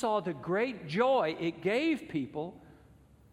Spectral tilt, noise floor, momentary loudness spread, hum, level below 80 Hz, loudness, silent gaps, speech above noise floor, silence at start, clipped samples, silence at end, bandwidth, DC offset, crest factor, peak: -6.5 dB/octave; -59 dBFS; 10 LU; none; -66 dBFS; -32 LUFS; none; 28 dB; 0 s; under 0.1%; 0.6 s; 12.5 kHz; under 0.1%; 18 dB; -16 dBFS